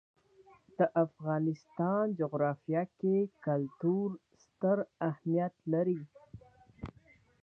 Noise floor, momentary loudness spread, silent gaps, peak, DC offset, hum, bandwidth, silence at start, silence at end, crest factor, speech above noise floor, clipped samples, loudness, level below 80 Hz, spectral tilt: -64 dBFS; 17 LU; none; -16 dBFS; under 0.1%; none; 6.4 kHz; 0.8 s; 0.55 s; 18 dB; 32 dB; under 0.1%; -33 LUFS; -68 dBFS; -10.5 dB/octave